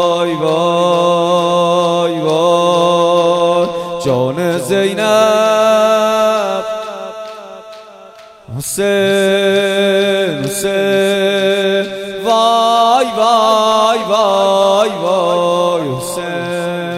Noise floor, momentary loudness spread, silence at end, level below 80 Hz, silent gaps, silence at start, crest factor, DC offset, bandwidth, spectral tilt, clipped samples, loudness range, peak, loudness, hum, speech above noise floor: -38 dBFS; 9 LU; 0 s; -54 dBFS; none; 0 s; 12 dB; under 0.1%; 16 kHz; -4 dB/octave; under 0.1%; 4 LU; 0 dBFS; -13 LUFS; none; 25 dB